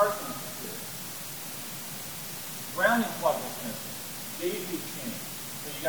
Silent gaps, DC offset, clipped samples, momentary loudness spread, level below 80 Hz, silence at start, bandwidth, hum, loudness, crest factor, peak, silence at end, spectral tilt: none; 0.2%; under 0.1%; 10 LU; -68 dBFS; 0 s; over 20 kHz; none; -32 LUFS; 22 dB; -10 dBFS; 0 s; -3 dB/octave